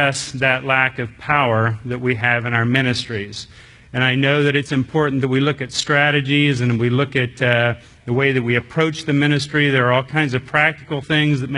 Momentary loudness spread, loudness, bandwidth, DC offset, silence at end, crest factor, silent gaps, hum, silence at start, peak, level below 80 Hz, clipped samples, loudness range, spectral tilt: 7 LU; -18 LUFS; 11 kHz; under 0.1%; 0 s; 18 dB; none; none; 0 s; 0 dBFS; -52 dBFS; under 0.1%; 2 LU; -5.5 dB/octave